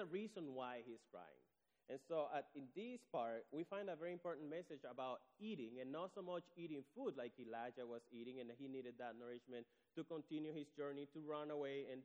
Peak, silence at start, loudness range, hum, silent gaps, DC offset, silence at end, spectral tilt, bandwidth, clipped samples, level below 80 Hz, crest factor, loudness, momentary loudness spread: -34 dBFS; 0 s; 3 LU; none; none; under 0.1%; 0 s; -6.5 dB/octave; over 20 kHz; under 0.1%; under -90 dBFS; 18 dB; -51 LUFS; 8 LU